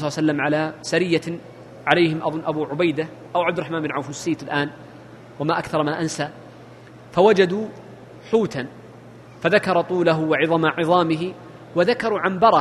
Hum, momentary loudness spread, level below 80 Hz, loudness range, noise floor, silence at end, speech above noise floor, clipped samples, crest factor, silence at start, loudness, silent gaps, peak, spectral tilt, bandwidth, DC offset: none; 13 LU; -60 dBFS; 5 LU; -43 dBFS; 0 s; 23 dB; under 0.1%; 22 dB; 0 s; -21 LUFS; none; 0 dBFS; -5.5 dB/octave; 12.5 kHz; under 0.1%